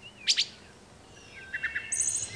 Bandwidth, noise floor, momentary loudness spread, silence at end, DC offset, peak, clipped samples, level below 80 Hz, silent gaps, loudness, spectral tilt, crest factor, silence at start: 11 kHz; -53 dBFS; 18 LU; 0 s; under 0.1%; -12 dBFS; under 0.1%; -62 dBFS; none; -29 LUFS; 1.5 dB/octave; 22 dB; 0 s